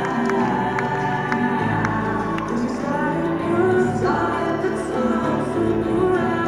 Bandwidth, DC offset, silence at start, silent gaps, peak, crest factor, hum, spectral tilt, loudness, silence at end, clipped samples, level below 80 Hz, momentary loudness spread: 11 kHz; 0.2%; 0 s; none; -6 dBFS; 14 dB; none; -7 dB/octave; -21 LUFS; 0 s; under 0.1%; -44 dBFS; 4 LU